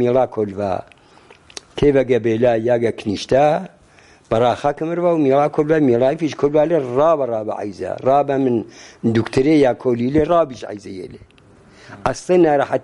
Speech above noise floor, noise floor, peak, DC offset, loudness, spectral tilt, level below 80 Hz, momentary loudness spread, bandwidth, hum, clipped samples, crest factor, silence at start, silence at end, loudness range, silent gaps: 32 dB; -49 dBFS; -2 dBFS; under 0.1%; -17 LUFS; -7 dB/octave; -46 dBFS; 12 LU; 11.5 kHz; none; under 0.1%; 16 dB; 0 s; 0.05 s; 2 LU; none